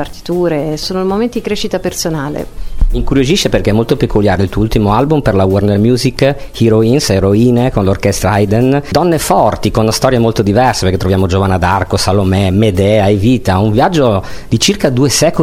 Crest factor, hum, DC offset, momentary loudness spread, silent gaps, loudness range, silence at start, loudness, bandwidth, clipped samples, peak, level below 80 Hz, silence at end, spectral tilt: 10 dB; none; under 0.1%; 6 LU; none; 3 LU; 0 s; -12 LUFS; 16 kHz; under 0.1%; 0 dBFS; -24 dBFS; 0 s; -5.5 dB/octave